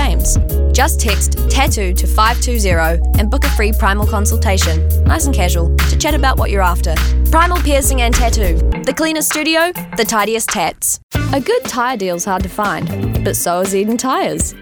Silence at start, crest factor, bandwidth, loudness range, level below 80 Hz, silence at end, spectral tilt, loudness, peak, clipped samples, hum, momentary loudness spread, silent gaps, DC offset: 0 s; 14 dB; 19.5 kHz; 3 LU; -16 dBFS; 0 s; -4.5 dB/octave; -14 LUFS; 0 dBFS; under 0.1%; none; 4 LU; 11.03-11.09 s; under 0.1%